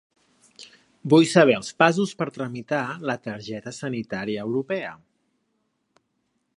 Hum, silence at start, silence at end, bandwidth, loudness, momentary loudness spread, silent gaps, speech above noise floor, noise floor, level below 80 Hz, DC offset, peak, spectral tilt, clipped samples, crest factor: none; 0.6 s; 1.6 s; 11.5 kHz; -23 LUFS; 16 LU; none; 51 dB; -74 dBFS; -68 dBFS; under 0.1%; 0 dBFS; -5.5 dB/octave; under 0.1%; 24 dB